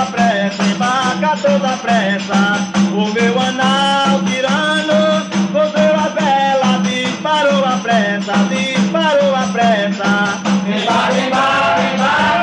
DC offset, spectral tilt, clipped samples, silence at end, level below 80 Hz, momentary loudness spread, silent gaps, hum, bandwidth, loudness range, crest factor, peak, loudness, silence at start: under 0.1%; -4.5 dB/octave; under 0.1%; 0 s; -54 dBFS; 3 LU; none; none; 10 kHz; 1 LU; 12 dB; -2 dBFS; -14 LUFS; 0 s